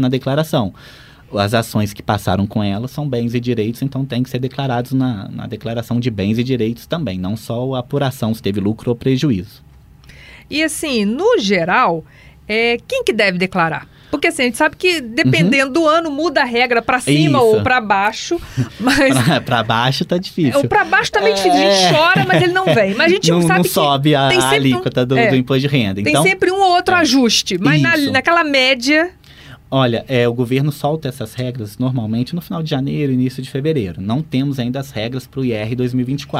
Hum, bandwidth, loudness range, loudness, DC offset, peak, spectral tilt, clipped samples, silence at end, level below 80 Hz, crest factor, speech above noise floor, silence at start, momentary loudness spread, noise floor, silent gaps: none; 16 kHz; 7 LU; -15 LUFS; under 0.1%; -2 dBFS; -5 dB/octave; under 0.1%; 0 s; -46 dBFS; 14 dB; 26 dB; 0 s; 10 LU; -42 dBFS; none